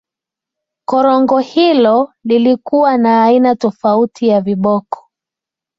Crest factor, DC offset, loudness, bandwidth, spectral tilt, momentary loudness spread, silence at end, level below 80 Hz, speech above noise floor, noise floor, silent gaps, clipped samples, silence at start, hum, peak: 12 dB; under 0.1%; -12 LUFS; 7.4 kHz; -7 dB/octave; 7 LU; 0.85 s; -58 dBFS; 74 dB; -86 dBFS; none; under 0.1%; 0.9 s; none; -2 dBFS